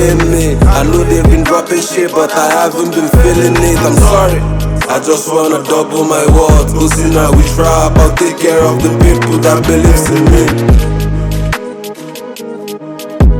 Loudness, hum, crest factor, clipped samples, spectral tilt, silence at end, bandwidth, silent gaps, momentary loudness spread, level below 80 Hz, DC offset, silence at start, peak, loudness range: -9 LUFS; none; 8 dB; 0.5%; -5.5 dB/octave; 0 s; 19 kHz; none; 11 LU; -14 dBFS; under 0.1%; 0 s; 0 dBFS; 2 LU